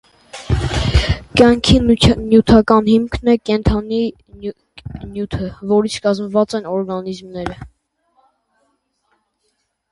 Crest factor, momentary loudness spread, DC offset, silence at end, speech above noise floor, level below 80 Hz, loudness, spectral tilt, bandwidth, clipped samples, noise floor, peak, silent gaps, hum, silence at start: 16 dB; 19 LU; under 0.1%; 2.25 s; 53 dB; -28 dBFS; -15 LUFS; -6 dB/octave; 11.5 kHz; under 0.1%; -68 dBFS; 0 dBFS; none; none; 0.35 s